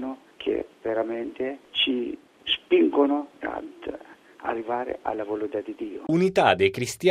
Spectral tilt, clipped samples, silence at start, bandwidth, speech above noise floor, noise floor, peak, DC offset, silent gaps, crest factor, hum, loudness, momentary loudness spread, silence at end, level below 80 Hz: -5 dB/octave; under 0.1%; 0 s; 15 kHz; 20 dB; -45 dBFS; -4 dBFS; under 0.1%; none; 22 dB; none; -26 LUFS; 15 LU; 0 s; -62 dBFS